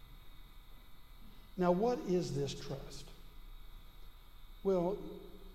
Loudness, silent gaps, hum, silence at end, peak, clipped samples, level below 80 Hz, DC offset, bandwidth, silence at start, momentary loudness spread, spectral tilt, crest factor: -36 LUFS; none; none; 0 s; -20 dBFS; under 0.1%; -54 dBFS; under 0.1%; 15 kHz; 0 s; 26 LU; -6.5 dB/octave; 20 dB